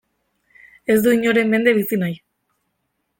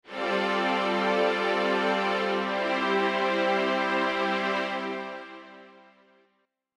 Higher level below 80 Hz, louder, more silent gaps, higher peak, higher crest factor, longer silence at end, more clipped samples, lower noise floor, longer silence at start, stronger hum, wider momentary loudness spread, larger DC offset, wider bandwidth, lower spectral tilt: first, -60 dBFS vs -70 dBFS; first, -17 LUFS vs -26 LUFS; neither; first, -4 dBFS vs -12 dBFS; about the same, 18 dB vs 14 dB; about the same, 1.05 s vs 1.1 s; neither; about the same, -73 dBFS vs -73 dBFS; first, 0.9 s vs 0.05 s; neither; first, 12 LU vs 8 LU; neither; first, 17 kHz vs 12.5 kHz; about the same, -5.5 dB/octave vs -4.5 dB/octave